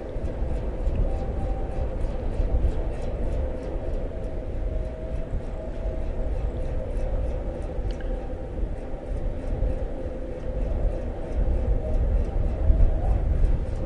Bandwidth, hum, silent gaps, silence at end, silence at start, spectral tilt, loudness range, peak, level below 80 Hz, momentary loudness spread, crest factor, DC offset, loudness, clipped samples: 4.7 kHz; none; none; 0 s; 0 s; -9 dB/octave; 5 LU; -6 dBFS; -26 dBFS; 7 LU; 18 dB; under 0.1%; -30 LUFS; under 0.1%